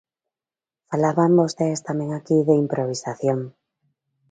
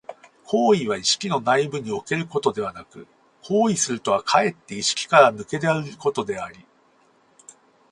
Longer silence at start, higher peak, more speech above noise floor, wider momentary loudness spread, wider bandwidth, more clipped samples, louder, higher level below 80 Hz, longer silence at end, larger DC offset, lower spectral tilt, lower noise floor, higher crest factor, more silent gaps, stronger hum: first, 0.9 s vs 0.1 s; about the same, -4 dBFS vs -2 dBFS; first, over 70 dB vs 38 dB; about the same, 10 LU vs 12 LU; second, 9.4 kHz vs 11.5 kHz; neither; about the same, -21 LUFS vs -22 LUFS; about the same, -66 dBFS vs -62 dBFS; second, 0.8 s vs 1.3 s; neither; first, -7 dB/octave vs -3.5 dB/octave; first, under -90 dBFS vs -59 dBFS; about the same, 18 dB vs 22 dB; neither; neither